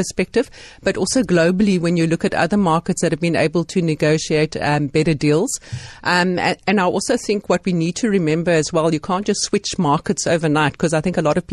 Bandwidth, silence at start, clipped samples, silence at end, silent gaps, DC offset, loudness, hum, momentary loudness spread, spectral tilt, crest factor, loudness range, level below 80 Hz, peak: 12.5 kHz; 0 s; under 0.1%; 0 s; none; under 0.1%; -18 LUFS; none; 4 LU; -5 dB/octave; 14 dB; 1 LU; -46 dBFS; -4 dBFS